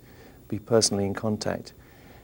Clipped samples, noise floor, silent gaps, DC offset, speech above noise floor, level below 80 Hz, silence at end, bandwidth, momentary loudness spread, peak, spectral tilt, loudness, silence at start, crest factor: under 0.1%; -50 dBFS; none; under 0.1%; 24 dB; -58 dBFS; 0.05 s; over 20 kHz; 15 LU; -6 dBFS; -4 dB/octave; -26 LUFS; 0.2 s; 22 dB